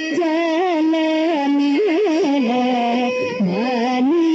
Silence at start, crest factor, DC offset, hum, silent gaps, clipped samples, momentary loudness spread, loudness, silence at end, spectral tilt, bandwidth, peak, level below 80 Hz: 0 s; 8 dB; under 0.1%; none; none; under 0.1%; 3 LU; -18 LUFS; 0 s; -4 dB/octave; 8 kHz; -10 dBFS; -70 dBFS